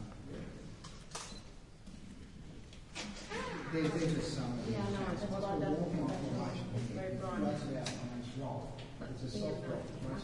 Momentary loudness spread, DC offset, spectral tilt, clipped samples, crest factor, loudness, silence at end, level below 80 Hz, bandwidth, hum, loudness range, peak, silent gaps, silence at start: 17 LU; under 0.1%; -6 dB/octave; under 0.1%; 18 dB; -39 LUFS; 0 s; -54 dBFS; 11.5 kHz; none; 9 LU; -22 dBFS; none; 0 s